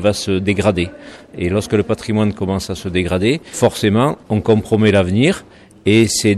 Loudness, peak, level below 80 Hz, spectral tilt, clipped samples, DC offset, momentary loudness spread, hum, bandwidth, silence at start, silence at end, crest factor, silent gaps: -16 LUFS; -2 dBFS; -42 dBFS; -5.5 dB/octave; under 0.1%; under 0.1%; 8 LU; none; 13.5 kHz; 0 s; 0 s; 14 dB; none